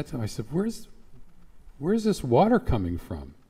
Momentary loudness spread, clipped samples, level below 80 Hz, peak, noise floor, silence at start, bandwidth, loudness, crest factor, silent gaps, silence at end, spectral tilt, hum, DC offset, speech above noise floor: 14 LU; under 0.1%; -42 dBFS; -10 dBFS; -47 dBFS; 0 s; 16 kHz; -26 LUFS; 18 dB; none; 0.15 s; -7 dB/octave; none; under 0.1%; 21 dB